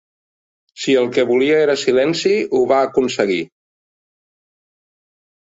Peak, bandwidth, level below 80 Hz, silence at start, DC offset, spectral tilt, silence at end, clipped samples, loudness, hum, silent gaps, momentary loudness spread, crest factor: -2 dBFS; 8 kHz; -62 dBFS; 0.75 s; under 0.1%; -4.5 dB/octave; 1.95 s; under 0.1%; -16 LUFS; none; none; 5 LU; 16 dB